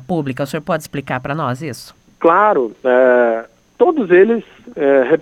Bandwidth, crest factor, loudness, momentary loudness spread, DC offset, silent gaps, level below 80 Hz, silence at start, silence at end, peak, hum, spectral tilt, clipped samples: 14.5 kHz; 16 dB; -15 LUFS; 12 LU; under 0.1%; none; -54 dBFS; 0 s; 0 s; 0 dBFS; none; -6.5 dB/octave; under 0.1%